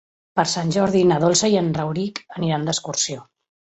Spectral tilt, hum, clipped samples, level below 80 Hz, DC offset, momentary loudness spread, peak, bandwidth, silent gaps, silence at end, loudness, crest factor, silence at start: -4.5 dB/octave; none; under 0.1%; -56 dBFS; under 0.1%; 10 LU; -4 dBFS; 8.2 kHz; none; 0.45 s; -20 LUFS; 18 dB; 0.35 s